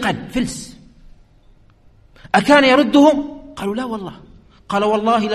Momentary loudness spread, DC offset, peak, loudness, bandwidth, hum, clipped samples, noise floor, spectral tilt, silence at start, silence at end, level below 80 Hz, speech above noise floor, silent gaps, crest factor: 19 LU; under 0.1%; 0 dBFS; -16 LUFS; 13 kHz; none; under 0.1%; -49 dBFS; -4.5 dB/octave; 0 s; 0 s; -46 dBFS; 34 dB; none; 18 dB